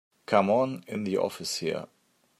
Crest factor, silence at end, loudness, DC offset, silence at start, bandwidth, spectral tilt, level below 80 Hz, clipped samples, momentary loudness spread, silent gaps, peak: 22 dB; 0.55 s; -28 LUFS; under 0.1%; 0.3 s; 15.5 kHz; -4.5 dB/octave; -74 dBFS; under 0.1%; 11 LU; none; -8 dBFS